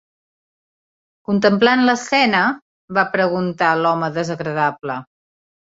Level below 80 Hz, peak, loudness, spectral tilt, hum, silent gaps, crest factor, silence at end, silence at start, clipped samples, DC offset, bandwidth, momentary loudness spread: -62 dBFS; -2 dBFS; -17 LUFS; -5 dB/octave; none; 2.62-2.88 s; 18 dB; 0.75 s; 1.3 s; under 0.1%; under 0.1%; 7.8 kHz; 14 LU